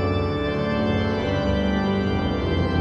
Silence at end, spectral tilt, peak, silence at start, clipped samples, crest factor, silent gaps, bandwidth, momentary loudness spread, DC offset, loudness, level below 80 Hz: 0 s; -7.5 dB/octave; -10 dBFS; 0 s; under 0.1%; 12 dB; none; 7.4 kHz; 2 LU; under 0.1%; -23 LUFS; -34 dBFS